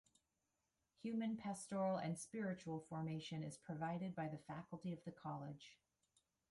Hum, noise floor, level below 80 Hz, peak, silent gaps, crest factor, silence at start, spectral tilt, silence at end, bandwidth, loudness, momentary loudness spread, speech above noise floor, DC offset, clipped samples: none; -89 dBFS; -82 dBFS; -32 dBFS; none; 16 dB; 1.05 s; -6 dB/octave; 0.75 s; 11.5 kHz; -47 LUFS; 10 LU; 42 dB; under 0.1%; under 0.1%